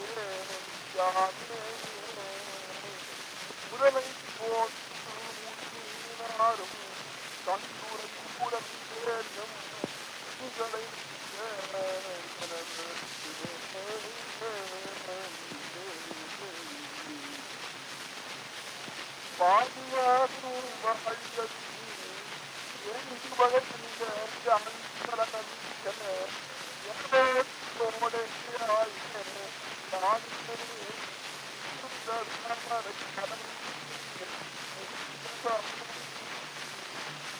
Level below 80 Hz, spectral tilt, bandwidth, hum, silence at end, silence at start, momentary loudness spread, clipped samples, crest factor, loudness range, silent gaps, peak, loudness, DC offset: -78 dBFS; -2 dB/octave; over 20 kHz; none; 0 s; 0 s; 12 LU; under 0.1%; 22 dB; 8 LU; none; -12 dBFS; -34 LUFS; under 0.1%